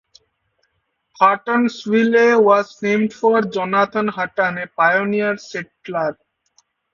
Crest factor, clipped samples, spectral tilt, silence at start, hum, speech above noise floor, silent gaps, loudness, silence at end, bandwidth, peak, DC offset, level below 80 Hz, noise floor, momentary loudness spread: 18 dB; under 0.1%; -6 dB/octave; 1.2 s; none; 53 dB; none; -17 LUFS; 0.8 s; 7.4 kHz; 0 dBFS; under 0.1%; -64 dBFS; -70 dBFS; 10 LU